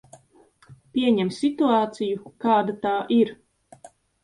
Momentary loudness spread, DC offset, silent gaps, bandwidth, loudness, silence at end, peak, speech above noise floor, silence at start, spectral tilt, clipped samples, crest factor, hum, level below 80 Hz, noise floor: 7 LU; under 0.1%; none; 11 kHz; -23 LUFS; 0.35 s; -8 dBFS; 35 dB; 0.7 s; -6.5 dB/octave; under 0.1%; 16 dB; none; -66 dBFS; -57 dBFS